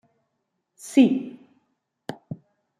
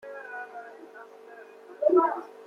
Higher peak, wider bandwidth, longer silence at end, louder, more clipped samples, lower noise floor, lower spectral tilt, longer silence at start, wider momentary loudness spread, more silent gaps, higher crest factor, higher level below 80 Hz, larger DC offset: first, -6 dBFS vs -10 dBFS; first, 13 kHz vs 5.6 kHz; first, 0.45 s vs 0 s; first, -21 LUFS vs -26 LUFS; neither; first, -78 dBFS vs -48 dBFS; about the same, -5.5 dB/octave vs -6 dB/octave; first, 0.85 s vs 0.05 s; second, 22 LU vs 25 LU; neither; about the same, 22 dB vs 20 dB; first, -76 dBFS vs -84 dBFS; neither